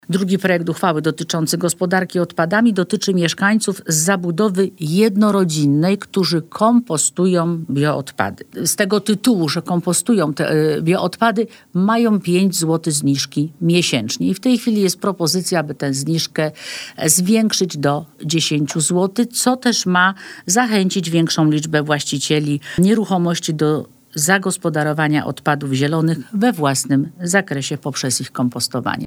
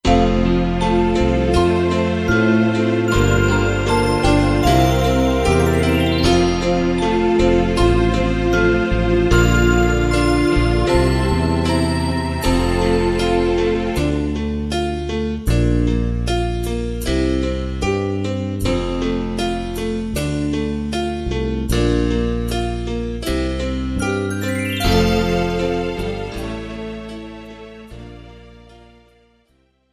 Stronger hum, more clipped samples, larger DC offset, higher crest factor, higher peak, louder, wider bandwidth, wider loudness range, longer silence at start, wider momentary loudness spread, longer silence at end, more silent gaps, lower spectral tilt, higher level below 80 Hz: neither; neither; neither; about the same, 16 dB vs 16 dB; about the same, 0 dBFS vs -2 dBFS; about the same, -17 LUFS vs -18 LUFS; first, 20 kHz vs 15 kHz; second, 2 LU vs 6 LU; about the same, 0.1 s vs 0.05 s; second, 5 LU vs 8 LU; second, 0 s vs 1.4 s; neither; second, -4.5 dB/octave vs -6 dB/octave; second, -60 dBFS vs -24 dBFS